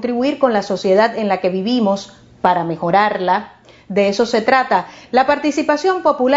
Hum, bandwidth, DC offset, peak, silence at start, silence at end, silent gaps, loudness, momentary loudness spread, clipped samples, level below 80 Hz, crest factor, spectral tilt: none; 7.8 kHz; under 0.1%; 0 dBFS; 0 s; 0 s; none; -16 LUFS; 5 LU; under 0.1%; -56 dBFS; 16 dB; -5.5 dB/octave